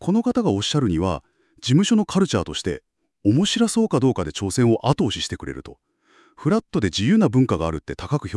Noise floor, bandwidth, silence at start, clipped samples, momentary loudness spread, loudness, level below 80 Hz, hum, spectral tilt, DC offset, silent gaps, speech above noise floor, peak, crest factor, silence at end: -57 dBFS; 12 kHz; 0 s; under 0.1%; 11 LU; -21 LUFS; -48 dBFS; none; -5.5 dB/octave; under 0.1%; none; 37 dB; -4 dBFS; 18 dB; 0 s